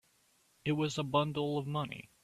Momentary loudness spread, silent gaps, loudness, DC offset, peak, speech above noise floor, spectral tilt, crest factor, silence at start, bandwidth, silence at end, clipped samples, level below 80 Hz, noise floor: 8 LU; none; -35 LUFS; under 0.1%; -16 dBFS; 37 dB; -6 dB/octave; 20 dB; 0.65 s; 13.5 kHz; 0.2 s; under 0.1%; -68 dBFS; -71 dBFS